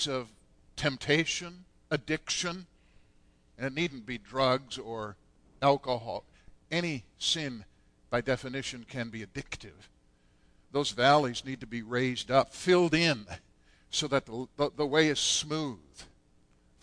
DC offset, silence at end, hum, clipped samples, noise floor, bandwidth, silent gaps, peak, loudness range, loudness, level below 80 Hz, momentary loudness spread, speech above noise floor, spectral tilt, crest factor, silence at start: under 0.1%; 0.8 s; none; under 0.1%; -65 dBFS; 10.5 kHz; none; -10 dBFS; 7 LU; -30 LUFS; -58 dBFS; 15 LU; 34 dB; -4 dB/octave; 22 dB; 0 s